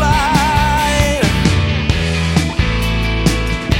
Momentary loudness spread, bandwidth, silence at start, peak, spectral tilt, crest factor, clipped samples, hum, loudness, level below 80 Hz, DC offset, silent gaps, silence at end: 4 LU; 16.5 kHz; 0 s; 0 dBFS; -5 dB/octave; 14 dB; under 0.1%; none; -15 LUFS; -20 dBFS; under 0.1%; none; 0 s